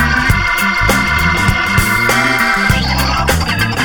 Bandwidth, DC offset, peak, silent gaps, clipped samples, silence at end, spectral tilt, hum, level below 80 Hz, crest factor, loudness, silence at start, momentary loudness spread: over 20 kHz; under 0.1%; 0 dBFS; none; under 0.1%; 0 s; -4 dB/octave; none; -22 dBFS; 12 dB; -12 LUFS; 0 s; 3 LU